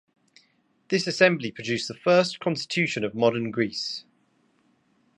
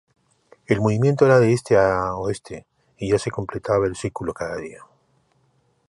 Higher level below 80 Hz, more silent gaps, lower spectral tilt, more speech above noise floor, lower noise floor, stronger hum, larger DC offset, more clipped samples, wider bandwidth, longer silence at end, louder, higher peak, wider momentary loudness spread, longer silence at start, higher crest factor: second, -70 dBFS vs -48 dBFS; neither; second, -4.5 dB/octave vs -7 dB/octave; about the same, 42 dB vs 44 dB; about the same, -66 dBFS vs -64 dBFS; neither; neither; neither; about the same, 11 kHz vs 11.5 kHz; about the same, 1.15 s vs 1.15 s; second, -24 LUFS vs -21 LUFS; about the same, -4 dBFS vs -2 dBFS; second, 9 LU vs 17 LU; first, 0.9 s vs 0.7 s; about the same, 22 dB vs 20 dB